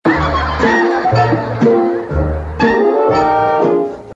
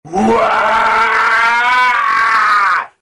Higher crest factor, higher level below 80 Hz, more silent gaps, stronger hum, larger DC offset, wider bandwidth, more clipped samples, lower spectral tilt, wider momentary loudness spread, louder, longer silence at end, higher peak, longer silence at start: about the same, 12 dB vs 8 dB; first, -30 dBFS vs -46 dBFS; neither; neither; neither; second, 7.8 kHz vs 15 kHz; neither; first, -7.5 dB/octave vs -3.5 dB/octave; first, 5 LU vs 2 LU; about the same, -13 LUFS vs -11 LUFS; second, 0 s vs 0.15 s; first, 0 dBFS vs -4 dBFS; about the same, 0.05 s vs 0.05 s